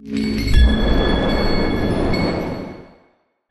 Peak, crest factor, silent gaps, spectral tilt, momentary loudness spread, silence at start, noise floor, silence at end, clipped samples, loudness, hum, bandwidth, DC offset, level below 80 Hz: -2 dBFS; 14 dB; none; -6.5 dB/octave; 12 LU; 0 s; -59 dBFS; 0.6 s; under 0.1%; -19 LUFS; none; 12.5 kHz; under 0.1%; -20 dBFS